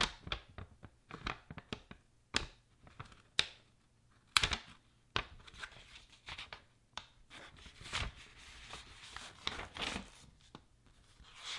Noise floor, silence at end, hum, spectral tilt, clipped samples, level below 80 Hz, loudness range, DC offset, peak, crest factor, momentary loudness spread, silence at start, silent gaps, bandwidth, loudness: -69 dBFS; 0 s; none; -2 dB/octave; under 0.1%; -56 dBFS; 9 LU; under 0.1%; -6 dBFS; 38 dB; 22 LU; 0 s; none; 11.5 kHz; -41 LUFS